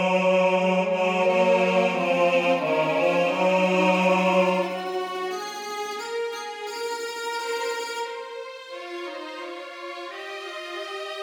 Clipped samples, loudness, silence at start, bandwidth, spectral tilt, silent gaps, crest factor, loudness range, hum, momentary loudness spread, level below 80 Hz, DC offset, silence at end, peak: under 0.1%; -24 LUFS; 0 s; 17.5 kHz; -5 dB/octave; none; 16 dB; 11 LU; none; 15 LU; -78 dBFS; under 0.1%; 0 s; -8 dBFS